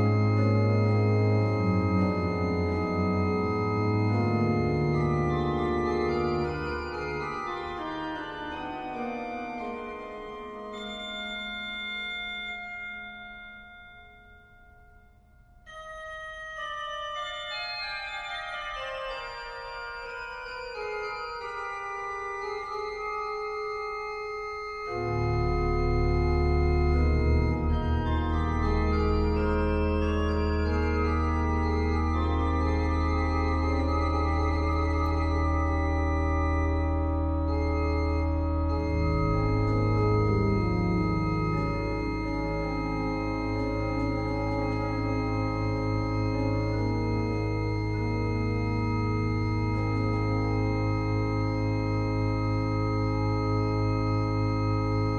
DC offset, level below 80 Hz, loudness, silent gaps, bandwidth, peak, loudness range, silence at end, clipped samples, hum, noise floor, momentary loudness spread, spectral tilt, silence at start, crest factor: under 0.1%; -34 dBFS; -28 LUFS; none; 7.6 kHz; -14 dBFS; 9 LU; 0 s; under 0.1%; none; -56 dBFS; 10 LU; -8 dB/octave; 0 s; 14 dB